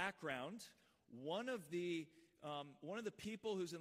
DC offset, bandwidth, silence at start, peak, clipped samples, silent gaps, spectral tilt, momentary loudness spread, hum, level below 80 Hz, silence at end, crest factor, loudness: under 0.1%; 15.5 kHz; 0 s; -28 dBFS; under 0.1%; none; -4.5 dB/octave; 12 LU; none; -84 dBFS; 0 s; 20 dB; -48 LUFS